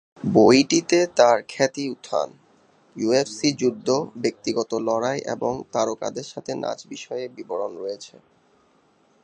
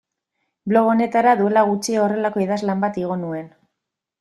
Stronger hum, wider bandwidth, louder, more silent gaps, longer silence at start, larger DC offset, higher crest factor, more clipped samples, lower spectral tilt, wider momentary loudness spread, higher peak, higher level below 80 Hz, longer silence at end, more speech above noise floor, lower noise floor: neither; second, 10.5 kHz vs 12.5 kHz; second, -23 LUFS vs -19 LUFS; neither; second, 0.2 s vs 0.65 s; neither; first, 22 dB vs 16 dB; neither; second, -4.5 dB/octave vs -6 dB/octave; first, 15 LU vs 10 LU; first, 0 dBFS vs -4 dBFS; about the same, -64 dBFS vs -64 dBFS; first, 1.15 s vs 0.75 s; second, 39 dB vs 63 dB; second, -61 dBFS vs -82 dBFS